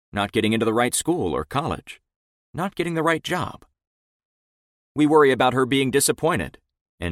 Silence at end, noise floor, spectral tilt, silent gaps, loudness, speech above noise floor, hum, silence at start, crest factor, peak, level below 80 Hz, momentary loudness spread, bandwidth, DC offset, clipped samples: 0 s; under -90 dBFS; -4.5 dB/octave; 2.16-2.53 s, 3.87-4.95 s, 6.81-6.98 s; -21 LUFS; over 69 dB; none; 0.15 s; 18 dB; -4 dBFS; -50 dBFS; 16 LU; 16 kHz; under 0.1%; under 0.1%